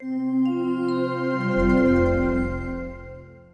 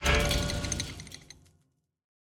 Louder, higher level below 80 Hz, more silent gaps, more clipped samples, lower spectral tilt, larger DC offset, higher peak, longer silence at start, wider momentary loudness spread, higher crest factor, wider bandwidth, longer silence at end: first, -23 LUFS vs -30 LUFS; about the same, -36 dBFS vs -38 dBFS; neither; neither; first, -8.5 dB/octave vs -3.5 dB/octave; neither; first, -8 dBFS vs -12 dBFS; about the same, 0 s vs 0 s; second, 15 LU vs 20 LU; second, 14 dB vs 20 dB; second, 6.6 kHz vs 18 kHz; second, 0.15 s vs 1 s